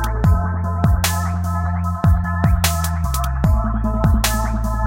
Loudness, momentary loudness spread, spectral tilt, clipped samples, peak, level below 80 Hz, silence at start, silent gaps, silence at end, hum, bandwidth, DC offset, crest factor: -19 LUFS; 4 LU; -5.5 dB/octave; under 0.1%; -2 dBFS; -22 dBFS; 0 s; none; 0 s; none; 17 kHz; under 0.1%; 14 dB